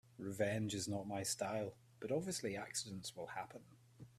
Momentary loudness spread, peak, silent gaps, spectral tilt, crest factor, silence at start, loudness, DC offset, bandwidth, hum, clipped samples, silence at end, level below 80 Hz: 11 LU; -24 dBFS; none; -4 dB/octave; 20 dB; 0.2 s; -43 LUFS; under 0.1%; 15.5 kHz; none; under 0.1%; 0.05 s; -76 dBFS